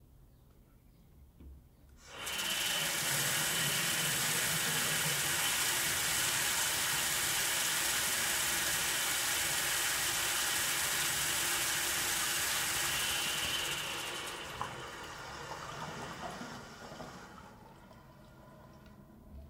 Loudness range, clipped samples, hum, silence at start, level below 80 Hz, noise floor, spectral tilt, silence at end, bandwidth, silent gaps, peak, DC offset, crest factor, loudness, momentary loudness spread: 15 LU; under 0.1%; none; 0.2 s; -60 dBFS; -61 dBFS; -0.5 dB/octave; 0 s; 16 kHz; none; -18 dBFS; under 0.1%; 18 dB; -31 LUFS; 14 LU